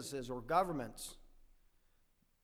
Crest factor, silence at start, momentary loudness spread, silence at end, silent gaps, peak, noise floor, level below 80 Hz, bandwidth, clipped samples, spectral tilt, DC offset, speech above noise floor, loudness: 24 dB; 0 s; 14 LU; 1.05 s; none; -18 dBFS; -74 dBFS; -60 dBFS; over 20 kHz; under 0.1%; -4.5 dB/octave; under 0.1%; 35 dB; -38 LUFS